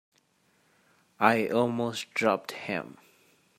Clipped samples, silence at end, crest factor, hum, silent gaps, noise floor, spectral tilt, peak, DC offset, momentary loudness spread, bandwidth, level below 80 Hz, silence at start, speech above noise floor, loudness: under 0.1%; 0.7 s; 24 dB; none; none; -69 dBFS; -5 dB/octave; -6 dBFS; under 0.1%; 10 LU; 16 kHz; -74 dBFS; 1.2 s; 41 dB; -28 LUFS